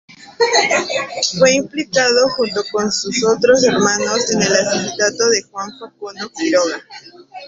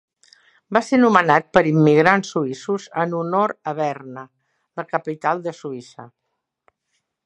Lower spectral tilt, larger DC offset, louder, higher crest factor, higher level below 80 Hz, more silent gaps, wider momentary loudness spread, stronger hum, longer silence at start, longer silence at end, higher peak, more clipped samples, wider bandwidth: second, -2.5 dB/octave vs -6.5 dB/octave; neither; first, -15 LUFS vs -19 LUFS; about the same, 16 dB vs 20 dB; first, -56 dBFS vs -62 dBFS; neither; second, 15 LU vs 19 LU; neither; second, 0.1 s vs 0.7 s; second, 0 s vs 1.2 s; about the same, 0 dBFS vs 0 dBFS; neither; second, 8 kHz vs 10.5 kHz